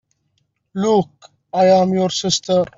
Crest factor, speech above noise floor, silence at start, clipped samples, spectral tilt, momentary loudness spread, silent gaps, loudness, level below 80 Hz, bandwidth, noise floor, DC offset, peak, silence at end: 16 dB; 51 dB; 0.75 s; under 0.1%; -5 dB/octave; 13 LU; none; -17 LUFS; -58 dBFS; 7.8 kHz; -68 dBFS; under 0.1%; -2 dBFS; 0.1 s